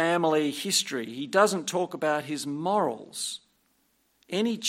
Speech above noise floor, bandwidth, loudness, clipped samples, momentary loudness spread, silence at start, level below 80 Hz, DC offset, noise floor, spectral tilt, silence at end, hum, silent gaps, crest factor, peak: 42 dB; 16.5 kHz; -27 LUFS; under 0.1%; 10 LU; 0 s; -78 dBFS; under 0.1%; -70 dBFS; -3 dB/octave; 0 s; none; none; 20 dB; -6 dBFS